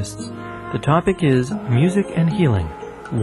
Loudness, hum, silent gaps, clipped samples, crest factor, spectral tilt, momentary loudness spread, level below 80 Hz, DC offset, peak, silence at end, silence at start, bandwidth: -19 LUFS; none; none; under 0.1%; 16 dB; -7.5 dB/octave; 14 LU; -42 dBFS; under 0.1%; -2 dBFS; 0 s; 0 s; 12 kHz